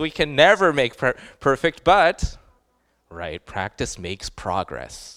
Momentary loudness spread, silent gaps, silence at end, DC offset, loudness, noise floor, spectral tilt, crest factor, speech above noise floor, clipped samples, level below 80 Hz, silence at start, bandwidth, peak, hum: 17 LU; none; 0.05 s; under 0.1%; -20 LUFS; -67 dBFS; -4 dB/octave; 22 dB; 45 dB; under 0.1%; -40 dBFS; 0 s; 14.5 kHz; 0 dBFS; none